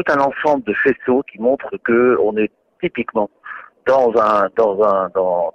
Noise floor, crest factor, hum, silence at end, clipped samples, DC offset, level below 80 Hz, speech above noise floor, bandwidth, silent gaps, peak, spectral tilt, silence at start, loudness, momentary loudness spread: -36 dBFS; 14 dB; none; 0.05 s; under 0.1%; under 0.1%; -54 dBFS; 20 dB; 7.2 kHz; none; -4 dBFS; -7 dB/octave; 0 s; -17 LUFS; 10 LU